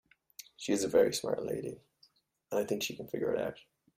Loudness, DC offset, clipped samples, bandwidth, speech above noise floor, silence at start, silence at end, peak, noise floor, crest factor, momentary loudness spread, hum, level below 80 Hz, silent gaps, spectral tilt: -33 LUFS; under 0.1%; under 0.1%; 16 kHz; 36 dB; 0.6 s; 0.4 s; -14 dBFS; -69 dBFS; 20 dB; 23 LU; none; -70 dBFS; none; -4 dB/octave